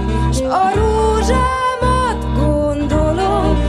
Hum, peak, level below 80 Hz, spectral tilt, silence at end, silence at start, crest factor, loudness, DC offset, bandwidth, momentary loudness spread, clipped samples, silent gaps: none; -4 dBFS; -20 dBFS; -6.5 dB/octave; 0 s; 0 s; 10 dB; -16 LUFS; under 0.1%; 11.5 kHz; 3 LU; under 0.1%; none